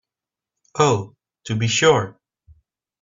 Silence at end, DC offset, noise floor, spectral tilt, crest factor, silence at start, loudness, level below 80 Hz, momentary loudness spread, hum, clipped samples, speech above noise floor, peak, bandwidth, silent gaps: 0.9 s; under 0.1%; -88 dBFS; -4 dB/octave; 20 dB; 0.75 s; -19 LUFS; -56 dBFS; 20 LU; none; under 0.1%; 70 dB; -4 dBFS; 7.8 kHz; none